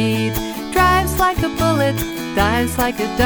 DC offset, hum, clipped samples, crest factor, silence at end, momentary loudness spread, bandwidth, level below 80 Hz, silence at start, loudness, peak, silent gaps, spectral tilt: under 0.1%; none; under 0.1%; 16 dB; 0 s; 7 LU; over 20 kHz; -30 dBFS; 0 s; -18 LUFS; -2 dBFS; none; -5 dB/octave